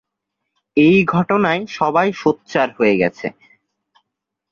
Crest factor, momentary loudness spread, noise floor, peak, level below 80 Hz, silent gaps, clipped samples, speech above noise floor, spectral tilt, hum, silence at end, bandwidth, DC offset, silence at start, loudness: 16 dB; 8 LU; -80 dBFS; -2 dBFS; -56 dBFS; none; under 0.1%; 64 dB; -7 dB/octave; none; 1.2 s; 7.2 kHz; under 0.1%; 0.75 s; -16 LUFS